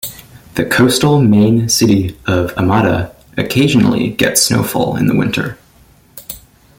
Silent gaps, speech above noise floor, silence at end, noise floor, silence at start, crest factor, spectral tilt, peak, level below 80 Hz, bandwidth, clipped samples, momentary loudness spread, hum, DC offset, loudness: none; 35 dB; 0.4 s; -47 dBFS; 0.05 s; 14 dB; -4.5 dB/octave; 0 dBFS; -42 dBFS; 17 kHz; under 0.1%; 15 LU; none; under 0.1%; -13 LUFS